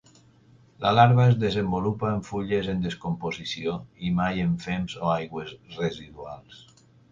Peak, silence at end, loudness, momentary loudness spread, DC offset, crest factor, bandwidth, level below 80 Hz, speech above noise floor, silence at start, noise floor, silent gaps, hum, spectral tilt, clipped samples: -4 dBFS; 0.55 s; -25 LUFS; 18 LU; under 0.1%; 22 dB; 7.6 kHz; -50 dBFS; 31 dB; 0.8 s; -56 dBFS; none; none; -7 dB/octave; under 0.1%